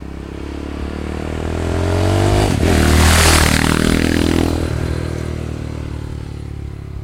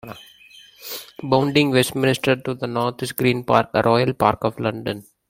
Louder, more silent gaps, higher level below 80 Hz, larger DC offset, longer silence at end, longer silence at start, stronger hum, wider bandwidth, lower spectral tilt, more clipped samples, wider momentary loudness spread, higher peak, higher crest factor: first, -16 LUFS vs -20 LUFS; neither; first, -22 dBFS vs -54 dBFS; neither; second, 0 s vs 0.25 s; about the same, 0 s vs 0.05 s; neither; about the same, 16 kHz vs 16.5 kHz; about the same, -4.5 dB/octave vs -5.5 dB/octave; neither; about the same, 17 LU vs 15 LU; about the same, 0 dBFS vs -2 dBFS; about the same, 16 dB vs 20 dB